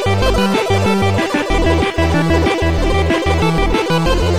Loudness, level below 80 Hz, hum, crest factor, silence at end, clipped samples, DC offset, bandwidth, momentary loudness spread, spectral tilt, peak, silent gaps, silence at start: -15 LUFS; -22 dBFS; none; 12 dB; 0 s; under 0.1%; 3%; 14.5 kHz; 2 LU; -6 dB/octave; -2 dBFS; none; 0 s